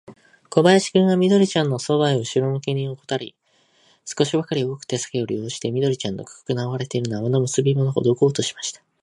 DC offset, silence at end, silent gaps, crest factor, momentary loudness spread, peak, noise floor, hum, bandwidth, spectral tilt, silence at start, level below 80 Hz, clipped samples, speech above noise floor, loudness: under 0.1%; 0.25 s; none; 20 dB; 12 LU; -2 dBFS; -60 dBFS; none; 11.5 kHz; -5.5 dB/octave; 0.1 s; -62 dBFS; under 0.1%; 39 dB; -21 LUFS